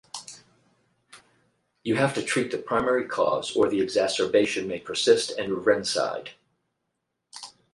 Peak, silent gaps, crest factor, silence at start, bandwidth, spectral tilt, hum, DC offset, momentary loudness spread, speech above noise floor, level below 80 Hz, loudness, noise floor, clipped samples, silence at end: -6 dBFS; none; 22 dB; 0.15 s; 11.5 kHz; -4 dB/octave; none; under 0.1%; 19 LU; 55 dB; -64 dBFS; -25 LUFS; -80 dBFS; under 0.1%; 0.25 s